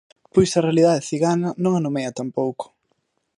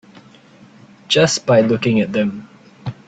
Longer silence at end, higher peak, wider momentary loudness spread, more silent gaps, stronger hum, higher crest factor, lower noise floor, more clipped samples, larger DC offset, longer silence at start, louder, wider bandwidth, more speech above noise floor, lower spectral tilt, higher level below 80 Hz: first, 0.75 s vs 0.15 s; about the same, -4 dBFS vs -2 dBFS; second, 10 LU vs 18 LU; neither; neither; about the same, 18 dB vs 18 dB; first, -71 dBFS vs -45 dBFS; neither; neither; second, 0.35 s vs 1.1 s; second, -20 LUFS vs -16 LUFS; first, 11.5 kHz vs 9.2 kHz; first, 51 dB vs 30 dB; first, -6 dB/octave vs -4.5 dB/octave; about the same, -56 dBFS vs -56 dBFS